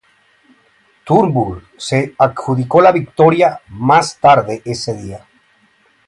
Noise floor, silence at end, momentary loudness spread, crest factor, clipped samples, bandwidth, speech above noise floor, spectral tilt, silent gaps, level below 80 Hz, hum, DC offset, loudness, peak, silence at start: -55 dBFS; 0.9 s; 12 LU; 14 dB; under 0.1%; 11.5 kHz; 41 dB; -6 dB/octave; none; -48 dBFS; none; under 0.1%; -14 LUFS; 0 dBFS; 1.05 s